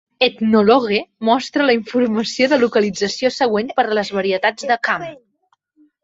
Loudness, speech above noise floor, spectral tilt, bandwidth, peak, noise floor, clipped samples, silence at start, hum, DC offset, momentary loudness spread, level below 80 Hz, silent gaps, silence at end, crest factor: -17 LUFS; 48 dB; -4.5 dB/octave; 8 kHz; -2 dBFS; -65 dBFS; under 0.1%; 0.2 s; none; under 0.1%; 6 LU; -60 dBFS; none; 0.9 s; 16 dB